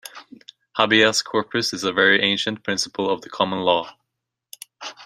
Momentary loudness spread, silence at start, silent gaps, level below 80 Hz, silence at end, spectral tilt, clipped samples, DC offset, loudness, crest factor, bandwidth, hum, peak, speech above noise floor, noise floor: 20 LU; 0.05 s; none; -64 dBFS; 0 s; -2.5 dB/octave; under 0.1%; under 0.1%; -20 LUFS; 22 dB; 16 kHz; none; 0 dBFS; 61 dB; -81 dBFS